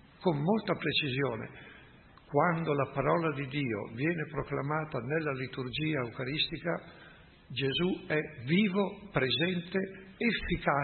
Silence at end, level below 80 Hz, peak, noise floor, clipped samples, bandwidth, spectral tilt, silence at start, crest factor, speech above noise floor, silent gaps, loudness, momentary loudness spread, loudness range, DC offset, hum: 0 s; -56 dBFS; -12 dBFS; -56 dBFS; under 0.1%; 4.4 kHz; -10 dB/octave; 0.2 s; 20 dB; 25 dB; none; -32 LUFS; 7 LU; 3 LU; under 0.1%; none